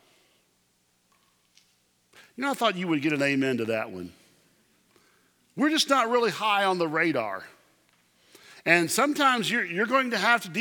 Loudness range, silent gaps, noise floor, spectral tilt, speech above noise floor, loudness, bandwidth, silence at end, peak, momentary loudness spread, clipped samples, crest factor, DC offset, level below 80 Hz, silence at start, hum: 4 LU; none; -69 dBFS; -3.5 dB/octave; 44 dB; -25 LUFS; 20 kHz; 0 s; -6 dBFS; 11 LU; under 0.1%; 22 dB; under 0.1%; -78 dBFS; 2.4 s; 60 Hz at -60 dBFS